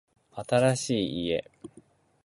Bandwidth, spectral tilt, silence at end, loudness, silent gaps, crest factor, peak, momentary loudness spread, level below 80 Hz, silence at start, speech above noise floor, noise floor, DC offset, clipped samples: 11.5 kHz; -5 dB/octave; 0.6 s; -27 LUFS; none; 20 dB; -10 dBFS; 19 LU; -60 dBFS; 0.35 s; 32 dB; -58 dBFS; under 0.1%; under 0.1%